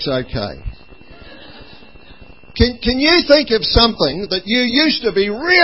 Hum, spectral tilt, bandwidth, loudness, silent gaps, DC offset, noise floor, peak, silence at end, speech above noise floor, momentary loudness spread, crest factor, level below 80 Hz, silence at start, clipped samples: none; -6.5 dB/octave; 8 kHz; -14 LUFS; none; 0.9%; -42 dBFS; 0 dBFS; 0 s; 27 dB; 13 LU; 16 dB; -30 dBFS; 0 s; under 0.1%